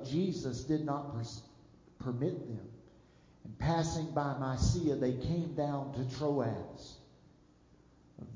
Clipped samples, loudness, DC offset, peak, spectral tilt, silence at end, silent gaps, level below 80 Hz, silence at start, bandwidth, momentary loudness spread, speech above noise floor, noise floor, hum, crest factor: under 0.1%; -36 LUFS; under 0.1%; -18 dBFS; -6.5 dB/octave; 0 s; none; -50 dBFS; 0 s; 7.6 kHz; 17 LU; 29 dB; -63 dBFS; none; 18 dB